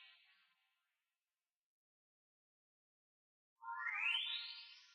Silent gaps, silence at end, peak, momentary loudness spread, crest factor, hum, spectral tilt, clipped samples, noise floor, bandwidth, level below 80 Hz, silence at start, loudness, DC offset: 1.56-3.56 s; 0 s; -28 dBFS; 16 LU; 22 dB; none; 5 dB/octave; under 0.1%; under -90 dBFS; 9.4 kHz; under -90 dBFS; 0 s; -41 LUFS; under 0.1%